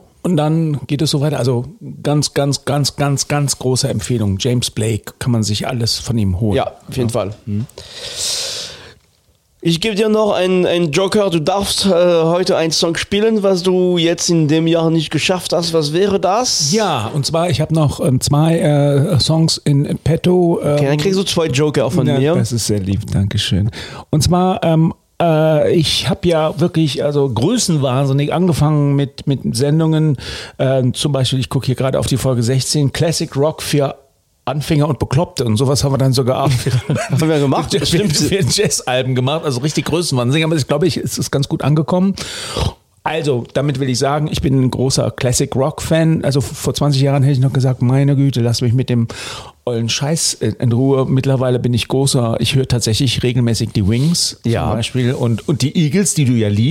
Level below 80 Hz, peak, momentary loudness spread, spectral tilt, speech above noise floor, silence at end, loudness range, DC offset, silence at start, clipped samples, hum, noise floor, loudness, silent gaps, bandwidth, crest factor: -40 dBFS; -4 dBFS; 5 LU; -5.5 dB/octave; 41 dB; 0 s; 3 LU; under 0.1%; 0.25 s; under 0.1%; none; -56 dBFS; -15 LUFS; none; 16 kHz; 12 dB